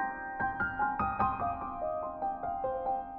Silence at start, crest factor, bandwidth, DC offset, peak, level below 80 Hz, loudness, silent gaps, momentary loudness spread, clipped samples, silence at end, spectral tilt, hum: 0 s; 18 dB; 4.9 kHz; under 0.1%; -16 dBFS; -52 dBFS; -34 LUFS; none; 5 LU; under 0.1%; 0 s; -6 dB/octave; none